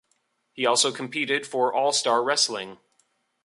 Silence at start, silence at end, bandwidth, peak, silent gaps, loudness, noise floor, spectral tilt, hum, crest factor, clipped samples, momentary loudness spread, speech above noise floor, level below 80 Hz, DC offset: 0.55 s; 0.7 s; 11.5 kHz; -8 dBFS; none; -23 LUFS; -72 dBFS; -1 dB/octave; none; 18 dB; under 0.1%; 7 LU; 48 dB; -78 dBFS; under 0.1%